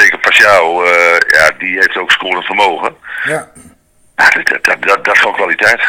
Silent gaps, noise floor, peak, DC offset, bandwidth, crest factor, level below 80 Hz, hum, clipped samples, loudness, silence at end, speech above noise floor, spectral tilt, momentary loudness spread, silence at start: none; -47 dBFS; 0 dBFS; under 0.1%; over 20 kHz; 10 dB; -48 dBFS; none; 2%; -9 LUFS; 0 s; 36 dB; -1.5 dB/octave; 11 LU; 0 s